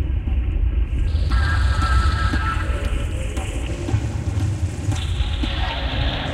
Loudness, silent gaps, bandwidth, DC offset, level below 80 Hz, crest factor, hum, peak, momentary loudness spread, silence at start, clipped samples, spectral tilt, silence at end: -23 LUFS; none; 11 kHz; under 0.1%; -22 dBFS; 14 dB; none; -6 dBFS; 6 LU; 0 s; under 0.1%; -5.5 dB/octave; 0 s